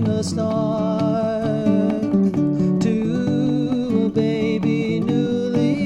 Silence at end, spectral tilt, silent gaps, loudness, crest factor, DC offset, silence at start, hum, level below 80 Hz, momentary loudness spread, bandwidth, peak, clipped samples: 0 s; -7.5 dB/octave; none; -20 LUFS; 14 dB; under 0.1%; 0 s; none; -52 dBFS; 2 LU; 10.5 kHz; -6 dBFS; under 0.1%